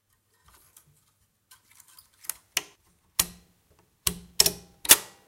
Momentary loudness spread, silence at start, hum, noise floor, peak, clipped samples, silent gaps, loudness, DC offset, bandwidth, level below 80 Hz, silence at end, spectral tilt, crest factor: 18 LU; 2.55 s; none; -69 dBFS; 0 dBFS; under 0.1%; none; -25 LUFS; under 0.1%; 17 kHz; -54 dBFS; 0.25 s; 0.5 dB/octave; 30 dB